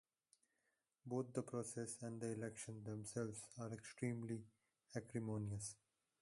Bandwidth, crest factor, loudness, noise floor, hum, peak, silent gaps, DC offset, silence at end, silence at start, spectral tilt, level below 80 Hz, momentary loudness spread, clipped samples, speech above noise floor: 11.5 kHz; 20 dB; -49 LUFS; -88 dBFS; none; -28 dBFS; none; under 0.1%; 0.45 s; 1.05 s; -6 dB/octave; -76 dBFS; 7 LU; under 0.1%; 40 dB